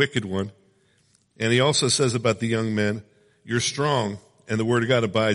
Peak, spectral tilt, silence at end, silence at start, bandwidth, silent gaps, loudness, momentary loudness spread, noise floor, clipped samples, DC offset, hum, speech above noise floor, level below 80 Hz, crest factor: -6 dBFS; -4.5 dB/octave; 0 s; 0 s; 11.5 kHz; none; -23 LUFS; 11 LU; -63 dBFS; under 0.1%; under 0.1%; none; 41 dB; -60 dBFS; 18 dB